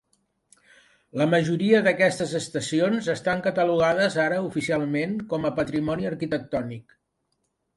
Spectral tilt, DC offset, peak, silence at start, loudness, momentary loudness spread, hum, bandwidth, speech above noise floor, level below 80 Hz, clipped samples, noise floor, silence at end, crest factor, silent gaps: -5.5 dB/octave; under 0.1%; -6 dBFS; 1.15 s; -24 LUFS; 8 LU; none; 11.5 kHz; 51 dB; -58 dBFS; under 0.1%; -75 dBFS; 0.95 s; 18 dB; none